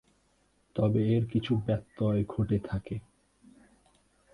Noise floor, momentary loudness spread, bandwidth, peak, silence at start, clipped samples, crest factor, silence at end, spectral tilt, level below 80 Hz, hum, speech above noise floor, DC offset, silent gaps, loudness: -69 dBFS; 11 LU; 9.6 kHz; -14 dBFS; 0.75 s; under 0.1%; 16 dB; 1.35 s; -9.5 dB/octave; -52 dBFS; none; 41 dB; under 0.1%; none; -30 LUFS